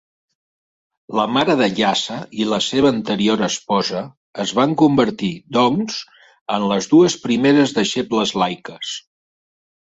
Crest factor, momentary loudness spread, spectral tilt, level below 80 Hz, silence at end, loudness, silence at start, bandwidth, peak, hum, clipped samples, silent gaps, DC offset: 16 dB; 13 LU; -4.5 dB/octave; -56 dBFS; 0.9 s; -18 LUFS; 1.1 s; 8 kHz; -2 dBFS; none; under 0.1%; 4.17-4.33 s, 6.41-6.46 s; under 0.1%